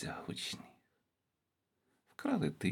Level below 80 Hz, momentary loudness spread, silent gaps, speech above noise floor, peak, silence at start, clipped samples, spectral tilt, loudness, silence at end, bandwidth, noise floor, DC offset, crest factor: -72 dBFS; 12 LU; none; 49 dB; -20 dBFS; 0 s; under 0.1%; -5 dB/octave; -39 LUFS; 0 s; 17.5 kHz; -86 dBFS; under 0.1%; 22 dB